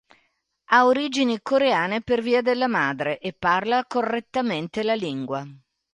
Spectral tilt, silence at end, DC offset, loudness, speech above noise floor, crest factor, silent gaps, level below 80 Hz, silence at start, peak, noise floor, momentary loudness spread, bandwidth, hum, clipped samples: -5 dB/octave; 0.35 s; under 0.1%; -23 LUFS; 47 dB; 20 dB; none; -62 dBFS; 0.7 s; -4 dBFS; -70 dBFS; 9 LU; 10.5 kHz; none; under 0.1%